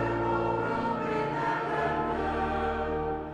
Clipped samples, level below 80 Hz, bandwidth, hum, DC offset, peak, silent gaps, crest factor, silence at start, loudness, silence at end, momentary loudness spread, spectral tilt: under 0.1%; -44 dBFS; 10 kHz; none; under 0.1%; -16 dBFS; none; 14 dB; 0 s; -29 LUFS; 0 s; 2 LU; -7.5 dB/octave